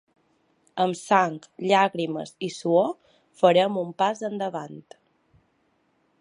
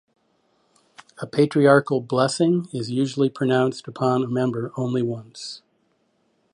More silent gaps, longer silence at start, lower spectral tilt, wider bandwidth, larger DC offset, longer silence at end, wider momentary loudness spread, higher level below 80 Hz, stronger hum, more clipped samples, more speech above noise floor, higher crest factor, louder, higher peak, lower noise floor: neither; second, 0.75 s vs 1.2 s; second, -5 dB/octave vs -6.5 dB/octave; about the same, 11.5 kHz vs 11.5 kHz; neither; first, 1.4 s vs 0.95 s; about the same, 15 LU vs 17 LU; second, -78 dBFS vs -68 dBFS; neither; neither; about the same, 45 dB vs 46 dB; about the same, 22 dB vs 20 dB; about the same, -24 LUFS vs -22 LUFS; about the same, -4 dBFS vs -2 dBFS; about the same, -68 dBFS vs -67 dBFS